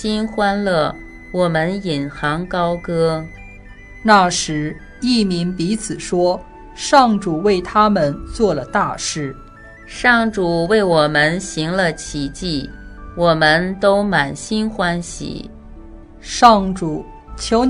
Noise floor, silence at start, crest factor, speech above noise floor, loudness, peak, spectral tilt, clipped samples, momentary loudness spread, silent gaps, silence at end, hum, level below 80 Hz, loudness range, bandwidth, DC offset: -39 dBFS; 0 s; 18 dB; 22 dB; -17 LUFS; 0 dBFS; -4.5 dB/octave; under 0.1%; 15 LU; none; 0 s; none; -38 dBFS; 2 LU; 11 kHz; under 0.1%